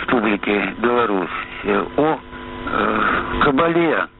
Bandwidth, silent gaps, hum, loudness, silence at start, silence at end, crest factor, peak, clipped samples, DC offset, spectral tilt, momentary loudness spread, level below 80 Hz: 4.2 kHz; none; none; -19 LUFS; 0 s; 0.1 s; 14 dB; -4 dBFS; under 0.1%; under 0.1%; -3.5 dB/octave; 9 LU; -40 dBFS